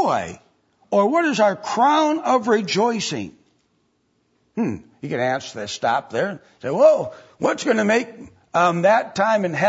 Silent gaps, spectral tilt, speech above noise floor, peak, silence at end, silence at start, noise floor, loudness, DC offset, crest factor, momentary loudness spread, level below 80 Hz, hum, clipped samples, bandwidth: none; -4.5 dB/octave; 47 dB; -2 dBFS; 0 s; 0 s; -66 dBFS; -20 LUFS; under 0.1%; 18 dB; 13 LU; -64 dBFS; none; under 0.1%; 8 kHz